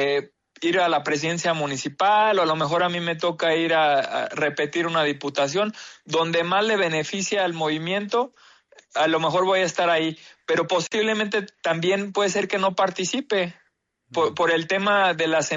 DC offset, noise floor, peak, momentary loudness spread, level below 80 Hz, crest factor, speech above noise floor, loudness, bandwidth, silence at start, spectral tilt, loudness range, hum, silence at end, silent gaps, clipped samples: under 0.1%; -68 dBFS; -10 dBFS; 6 LU; -70 dBFS; 14 dB; 46 dB; -22 LUFS; 8 kHz; 0 s; -3.5 dB/octave; 2 LU; none; 0 s; none; under 0.1%